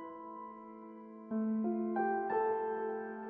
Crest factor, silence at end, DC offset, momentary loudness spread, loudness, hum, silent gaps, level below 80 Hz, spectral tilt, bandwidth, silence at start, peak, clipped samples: 14 dB; 0 s; under 0.1%; 17 LU; -36 LUFS; none; none; -84 dBFS; -7.5 dB/octave; 3.3 kHz; 0 s; -22 dBFS; under 0.1%